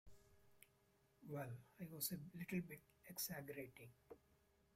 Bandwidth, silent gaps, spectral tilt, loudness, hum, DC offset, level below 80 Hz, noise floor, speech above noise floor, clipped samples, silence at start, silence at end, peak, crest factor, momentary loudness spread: 16 kHz; none; -4 dB/octave; -51 LUFS; none; under 0.1%; -80 dBFS; -78 dBFS; 27 dB; under 0.1%; 0.05 s; 0.4 s; -30 dBFS; 24 dB; 18 LU